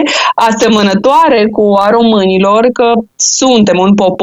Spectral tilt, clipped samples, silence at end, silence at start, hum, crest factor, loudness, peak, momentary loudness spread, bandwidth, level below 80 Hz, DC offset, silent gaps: -4 dB/octave; under 0.1%; 0 s; 0 s; none; 8 dB; -8 LUFS; 0 dBFS; 3 LU; 12 kHz; -44 dBFS; under 0.1%; none